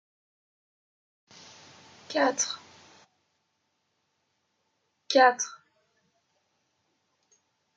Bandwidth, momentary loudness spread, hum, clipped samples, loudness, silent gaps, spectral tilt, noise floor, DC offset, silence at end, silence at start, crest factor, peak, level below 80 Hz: 9.4 kHz; 13 LU; none; under 0.1%; -25 LUFS; none; -0.5 dB/octave; -77 dBFS; under 0.1%; 2.25 s; 2.1 s; 26 dB; -6 dBFS; -90 dBFS